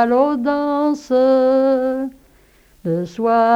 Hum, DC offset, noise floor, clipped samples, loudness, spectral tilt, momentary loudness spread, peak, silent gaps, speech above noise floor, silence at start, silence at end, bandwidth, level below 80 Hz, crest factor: none; under 0.1%; -52 dBFS; under 0.1%; -17 LUFS; -7.5 dB/octave; 10 LU; -2 dBFS; none; 36 dB; 0 s; 0 s; 7.8 kHz; -54 dBFS; 14 dB